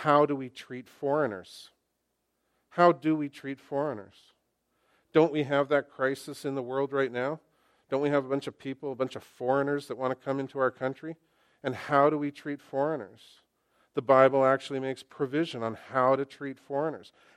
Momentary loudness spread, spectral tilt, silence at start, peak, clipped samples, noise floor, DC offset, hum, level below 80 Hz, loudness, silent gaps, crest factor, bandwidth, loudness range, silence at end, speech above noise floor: 16 LU; -6.5 dB/octave; 0 s; -6 dBFS; under 0.1%; -79 dBFS; under 0.1%; none; -78 dBFS; -29 LUFS; none; 24 dB; 13 kHz; 5 LU; 0.35 s; 51 dB